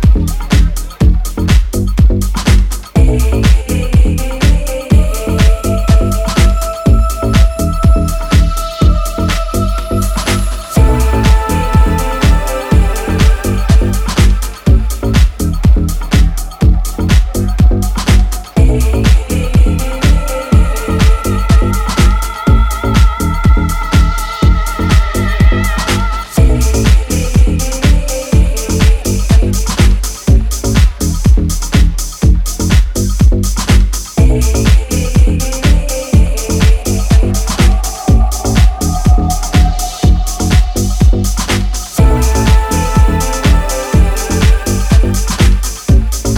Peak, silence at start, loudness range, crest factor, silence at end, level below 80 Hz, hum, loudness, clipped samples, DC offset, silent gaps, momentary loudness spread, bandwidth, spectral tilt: 0 dBFS; 0 s; 1 LU; 10 dB; 0 s; -12 dBFS; none; -12 LUFS; under 0.1%; under 0.1%; none; 3 LU; 16.5 kHz; -5.5 dB/octave